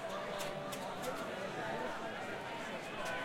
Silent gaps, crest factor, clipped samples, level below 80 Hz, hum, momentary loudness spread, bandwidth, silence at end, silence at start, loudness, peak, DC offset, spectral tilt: none; 14 dB; under 0.1%; -66 dBFS; none; 2 LU; 16.5 kHz; 0 s; 0 s; -41 LUFS; -26 dBFS; under 0.1%; -3.5 dB/octave